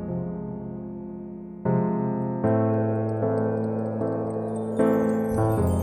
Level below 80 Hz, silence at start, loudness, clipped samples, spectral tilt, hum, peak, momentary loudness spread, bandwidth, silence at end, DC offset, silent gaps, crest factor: -48 dBFS; 0 s; -26 LUFS; under 0.1%; -9.5 dB/octave; none; -10 dBFS; 13 LU; 16 kHz; 0 s; under 0.1%; none; 16 dB